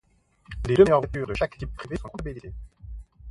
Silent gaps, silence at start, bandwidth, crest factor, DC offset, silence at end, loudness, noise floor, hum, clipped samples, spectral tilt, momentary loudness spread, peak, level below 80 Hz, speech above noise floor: none; 0.5 s; 11 kHz; 22 dB; under 0.1%; 0 s; -24 LUFS; -51 dBFS; none; under 0.1%; -7.5 dB/octave; 25 LU; -4 dBFS; -40 dBFS; 27 dB